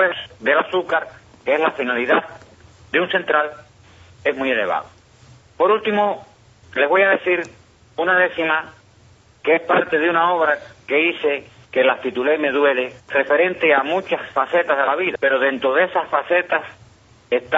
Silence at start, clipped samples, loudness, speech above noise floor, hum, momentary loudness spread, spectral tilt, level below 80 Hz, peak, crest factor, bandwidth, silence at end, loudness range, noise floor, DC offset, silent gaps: 0 s; under 0.1%; -19 LUFS; 32 dB; none; 8 LU; -1.5 dB/octave; -60 dBFS; -2 dBFS; 16 dB; 7.8 kHz; 0 s; 3 LU; -51 dBFS; under 0.1%; none